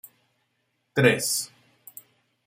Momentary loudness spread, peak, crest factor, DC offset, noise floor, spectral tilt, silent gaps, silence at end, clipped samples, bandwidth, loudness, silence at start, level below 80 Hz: 25 LU; -4 dBFS; 24 dB; under 0.1%; -74 dBFS; -3.5 dB/octave; none; 1 s; under 0.1%; 16 kHz; -23 LUFS; 0.95 s; -66 dBFS